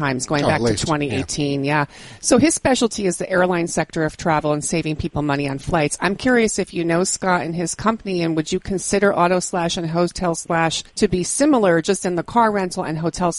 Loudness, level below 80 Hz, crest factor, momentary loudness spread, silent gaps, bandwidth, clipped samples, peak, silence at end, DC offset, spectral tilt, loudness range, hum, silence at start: -19 LUFS; -42 dBFS; 18 dB; 6 LU; none; 11.5 kHz; under 0.1%; -2 dBFS; 0 s; under 0.1%; -4.5 dB/octave; 1 LU; none; 0 s